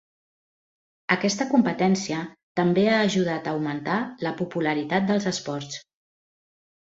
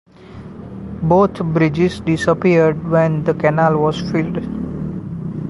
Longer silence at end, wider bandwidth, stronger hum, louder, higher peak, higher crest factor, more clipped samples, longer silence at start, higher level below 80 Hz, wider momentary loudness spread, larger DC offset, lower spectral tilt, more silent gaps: first, 1.05 s vs 0 s; second, 8 kHz vs 11.5 kHz; neither; second, -24 LUFS vs -17 LUFS; about the same, -4 dBFS vs -2 dBFS; first, 22 dB vs 16 dB; neither; first, 1.1 s vs 0.2 s; second, -66 dBFS vs -42 dBFS; second, 11 LU vs 17 LU; neither; second, -5 dB/octave vs -8 dB/octave; first, 2.43-2.55 s vs none